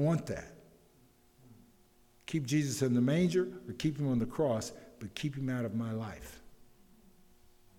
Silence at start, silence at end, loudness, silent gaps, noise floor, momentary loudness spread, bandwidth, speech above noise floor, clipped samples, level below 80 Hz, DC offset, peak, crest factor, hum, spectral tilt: 0 s; 1.25 s; -34 LUFS; none; -65 dBFS; 16 LU; 17 kHz; 32 dB; under 0.1%; -62 dBFS; under 0.1%; -18 dBFS; 16 dB; none; -6.5 dB/octave